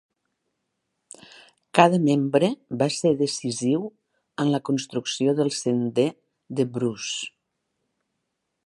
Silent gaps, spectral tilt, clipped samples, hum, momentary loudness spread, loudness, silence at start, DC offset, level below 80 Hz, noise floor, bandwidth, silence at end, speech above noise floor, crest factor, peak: none; -5 dB/octave; under 0.1%; none; 11 LU; -24 LUFS; 1.75 s; under 0.1%; -70 dBFS; -79 dBFS; 11.5 kHz; 1.4 s; 56 dB; 24 dB; 0 dBFS